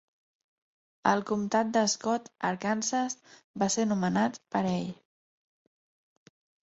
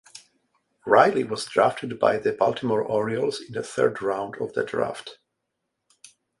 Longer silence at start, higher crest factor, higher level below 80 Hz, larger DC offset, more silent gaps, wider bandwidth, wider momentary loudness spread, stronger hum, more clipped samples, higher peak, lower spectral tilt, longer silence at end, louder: first, 1.05 s vs 0.15 s; about the same, 22 dB vs 24 dB; about the same, -70 dBFS vs -66 dBFS; neither; first, 3.44-3.54 s vs none; second, 8.2 kHz vs 11.5 kHz; second, 7 LU vs 12 LU; neither; neither; second, -8 dBFS vs -2 dBFS; about the same, -4 dB/octave vs -5 dB/octave; first, 1.7 s vs 1.25 s; second, -29 LUFS vs -24 LUFS